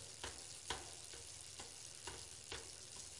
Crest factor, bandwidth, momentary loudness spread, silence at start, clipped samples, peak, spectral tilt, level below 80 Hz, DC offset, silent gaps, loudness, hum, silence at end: 26 dB; 11.5 kHz; 4 LU; 0 s; under 0.1%; -26 dBFS; -1 dB/octave; -68 dBFS; under 0.1%; none; -50 LUFS; none; 0 s